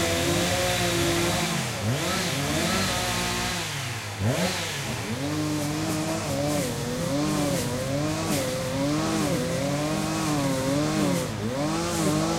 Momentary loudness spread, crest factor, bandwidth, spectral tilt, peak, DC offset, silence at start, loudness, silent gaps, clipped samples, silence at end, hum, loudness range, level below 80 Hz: 5 LU; 14 dB; 16 kHz; -4 dB/octave; -12 dBFS; under 0.1%; 0 s; -26 LUFS; none; under 0.1%; 0 s; none; 3 LU; -46 dBFS